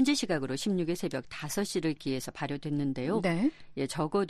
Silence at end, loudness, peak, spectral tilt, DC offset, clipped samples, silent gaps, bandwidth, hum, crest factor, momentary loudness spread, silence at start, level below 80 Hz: 0 s; -32 LUFS; -16 dBFS; -5 dB/octave; under 0.1%; under 0.1%; none; 13 kHz; none; 16 dB; 7 LU; 0 s; -60 dBFS